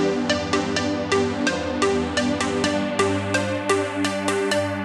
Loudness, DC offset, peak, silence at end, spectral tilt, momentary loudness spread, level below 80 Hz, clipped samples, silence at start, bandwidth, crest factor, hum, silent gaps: -22 LUFS; under 0.1%; -4 dBFS; 0 s; -4 dB/octave; 2 LU; -48 dBFS; under 0.1%; 0 s; 13 kHz; 20 dB; none; none